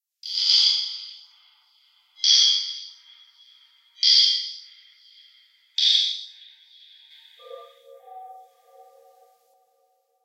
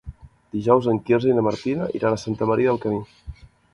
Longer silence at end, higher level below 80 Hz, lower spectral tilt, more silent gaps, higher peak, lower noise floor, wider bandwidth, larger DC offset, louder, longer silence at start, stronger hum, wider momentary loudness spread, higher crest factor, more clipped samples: first, 1.85 s vs 0.4 s; second, under -90 dBFS vs -48 dBFS; second, 10 dB/octave vs -7.5 dB/octave; neither; about the same, -4 dBFS vs -2 dBFS; first, -68 dBFS vs -41 dBFS; first, 15.5 kHz vs 11 kHz; neither; first, -18 LUFS vs -22 LUFS; first, 0.25 s vs 0.05 s; neither; first, 25 LU vs 13 LU; about the same, 22 dB vs 20 dB; neither